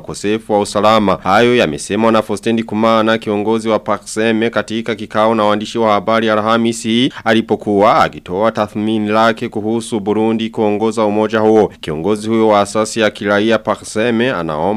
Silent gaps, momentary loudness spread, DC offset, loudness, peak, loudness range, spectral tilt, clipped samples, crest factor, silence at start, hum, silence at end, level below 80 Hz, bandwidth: none; 6 LU; under 0.1%; -14 LUFS; 0 dBFS; 2 LU; -5 dB/octave; under 0.1%; 14 dB; 0 s; none; 0 s; -48 dBFS; 13.5 kHz